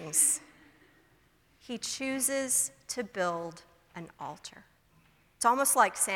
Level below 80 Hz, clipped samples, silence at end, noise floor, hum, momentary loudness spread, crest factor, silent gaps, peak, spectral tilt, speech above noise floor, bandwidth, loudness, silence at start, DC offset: -70 dBFS; under 0.1%; 0 s; -66 dBFS; none; 22 LU; 24 dB; none; -10 dBFS; -1.5 dB/octave; 35 dB; 19 kHz; -28 LUFS; 0 s; under 0.1%